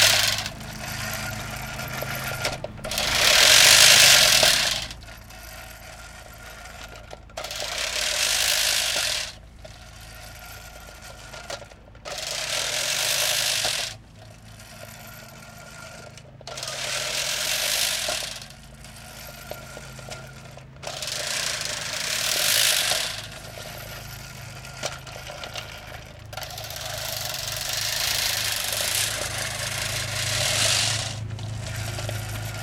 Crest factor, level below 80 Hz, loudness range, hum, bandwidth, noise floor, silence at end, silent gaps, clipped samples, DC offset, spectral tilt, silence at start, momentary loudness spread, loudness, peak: 24 dB; -48 dBFS; 18 LU; none; 18 kHz; -46 dBFS; 0 s; none; under 0.1%; under 0.1%; -0.5 dB/octave; 0 s; 23 LU; -21 LUFS; -2 dBFS